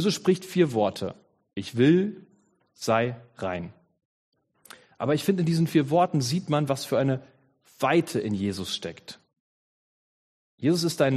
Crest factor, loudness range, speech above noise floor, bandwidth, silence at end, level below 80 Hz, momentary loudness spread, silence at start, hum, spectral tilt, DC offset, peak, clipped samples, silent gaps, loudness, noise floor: 18 dB; 5 LU; 39 dB; 13.5 kHz; 0 s; -66 dBFS; 13 LU; 0 s; none; -6 dB/octave; under 0.1%; -8 dBFS; under 0.1%; 4.05-4.32 s, 9.40-10.58 s; -26 LUFS; -64 dBFS